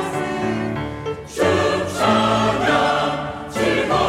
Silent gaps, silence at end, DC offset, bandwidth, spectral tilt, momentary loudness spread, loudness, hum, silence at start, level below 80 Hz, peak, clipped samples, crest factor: none; 0 s; under 0.1%; 16 kHz; -5 dB/octave; 10 LU; -20 LUFS; none; 0 s; -44 dBFS; -4 dBFS; under 0.1%; 16 dB